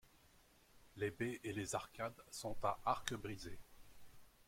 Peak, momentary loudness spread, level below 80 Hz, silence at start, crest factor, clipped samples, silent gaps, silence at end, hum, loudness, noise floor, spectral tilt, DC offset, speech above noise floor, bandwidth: -20 dBFS; 12 LU; -64 dBFS; 0.05 s; 26 dB; under 0.1%; none; 0.05 s; none; -44 LUFS; -69 dBFS; -4 dB/octave; under 0.1%; 26 dB; 16.5 kHz